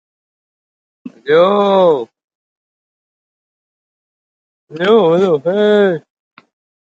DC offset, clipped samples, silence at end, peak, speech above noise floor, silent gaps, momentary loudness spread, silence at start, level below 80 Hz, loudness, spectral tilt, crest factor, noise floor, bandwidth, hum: under 0.1%; under 0.1%; 0.95 s; 0 dBFS; over 78 dB; 2.24-2.28 s, 2.35-4.67 s; 11 LU; 1.05 s; -66 dBFS; -12 LUFS; -7 dB/octave; 16 dB; under -90 dBFS; 7.8 kHz; none